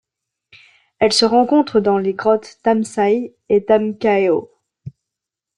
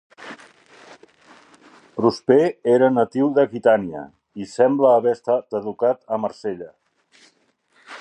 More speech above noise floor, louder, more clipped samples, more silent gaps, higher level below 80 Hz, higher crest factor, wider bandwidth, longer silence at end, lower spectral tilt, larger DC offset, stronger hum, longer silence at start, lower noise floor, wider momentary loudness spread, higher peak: first, 68 dB vs 44 dB; first, -16 LUFS vs -19 LUFS; neither; neither; first, -60 dBFS vs -66 dBFS; about the same, 16 dB vs 18 dB; first, 11 kHz vs 9.8 kHz; first, 0.7 s vs 0 s; second, -4.5 dB/octave vs -7 dB/octave; neither; neither; first, 1 s vs 0.2 s; first, -84 dBFS vs -62 dBFS; second, 5 LU vs 21 LU; about the same, -2 dBFS vs -2 dBFS